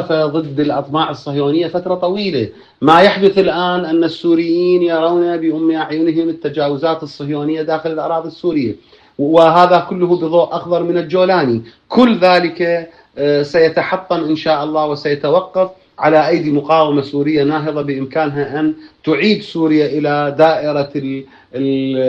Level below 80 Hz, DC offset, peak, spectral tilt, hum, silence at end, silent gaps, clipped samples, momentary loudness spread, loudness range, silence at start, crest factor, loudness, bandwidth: -56 dBFS; under 0.1%; 0 dBFS; -7.5 dB/octave; none; 0 s; none; under 0.1%; 9 LU; 3 LU; 0 s; 14 dB; -14 LUFS; 8 kHz